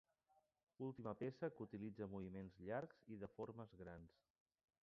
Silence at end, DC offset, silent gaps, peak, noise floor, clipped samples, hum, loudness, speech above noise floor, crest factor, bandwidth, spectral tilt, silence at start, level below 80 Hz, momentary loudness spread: 0.8 s; under 0.1%; 0.63-0.67 s; -34 dBFS; -83 dBFS; under 0.1%; none; -53 LUFS; 31 dB; 20 dB; 6.4 kHz; -7.5 dB/octave; 0.35 s; -76 dBFS; 8 LU